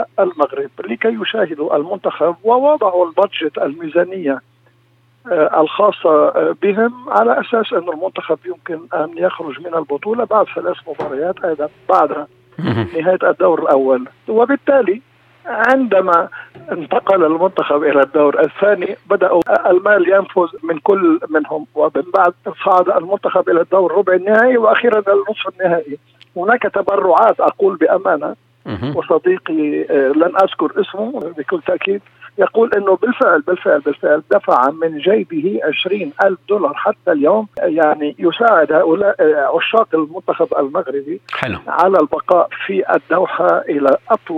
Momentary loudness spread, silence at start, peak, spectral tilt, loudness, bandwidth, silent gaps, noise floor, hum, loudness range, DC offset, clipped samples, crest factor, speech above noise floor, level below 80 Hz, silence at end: 9 LU; 0 s; 0 dBFS; -7.5 dB/octave; -15 LUFS; 5.8 kHz; none; -54 dBFS; none; 4 LU; under 0.1%; under 0.1%; 14 dB; 39 dB; -60 dBFS; 0 s